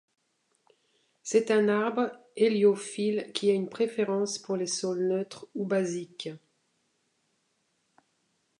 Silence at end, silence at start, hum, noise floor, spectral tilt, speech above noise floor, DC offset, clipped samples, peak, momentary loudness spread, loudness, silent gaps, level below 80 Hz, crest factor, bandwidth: 2.2 s; 1.25 s; none; -75 dBFS; -4.5 dB/octave; 47 dB; under 0.1%; under 0.1%; -10 dBFS; 12 LU; -28 LUFS; none; -82 dBFS; 20 dB; 11 kHz